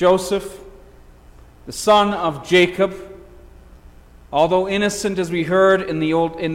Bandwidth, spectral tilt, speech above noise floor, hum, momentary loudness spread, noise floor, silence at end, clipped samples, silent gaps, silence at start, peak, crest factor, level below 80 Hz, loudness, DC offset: 16.5 kHz; -4.5 dB/octave; 27 dB; 60 Hz at -45 dBFS; 10 LU; -45 dBFS; 0 s; under 0.1%; none; 0 s; -4 dBFS; 16 dB; -46 dBFS; -18 LUFS; under 0.1%